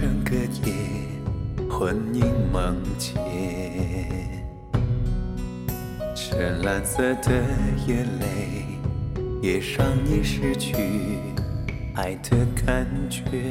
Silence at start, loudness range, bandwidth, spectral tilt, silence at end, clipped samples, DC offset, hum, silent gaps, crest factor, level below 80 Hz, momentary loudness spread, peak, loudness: 0 s; 3 LU; 16.5 kHz; -6 dB/octave; 0 s; under 0.1%; under 0.1%; none; none; 18 dB; -32 dBFS; 8 LU; -6 dBFS; -26 LUFS